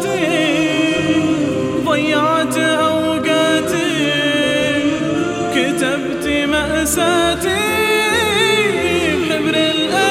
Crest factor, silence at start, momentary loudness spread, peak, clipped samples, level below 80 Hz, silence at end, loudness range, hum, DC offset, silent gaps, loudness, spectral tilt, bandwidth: 14 dB; 0 s; 4 LU; -2 dBFS; under 0.1%; -42 dBFS; 0 s; 2 LU; none; under 0.1%; none; -15 LUFS; -3.5 dB/octave; 16 kHz